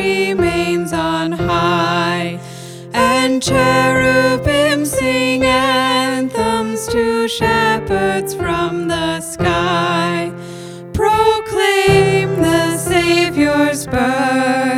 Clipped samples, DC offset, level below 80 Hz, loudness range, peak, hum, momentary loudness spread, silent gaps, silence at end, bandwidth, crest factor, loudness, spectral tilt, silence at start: under 0.1%; under 0.1%; -38 dBFS; 3 LU; -2 dBFS; none; 7 LU; none; 0 s; 17 kHz; 14 dB; -15 LUFS; -4.5 dB/octave; 0 s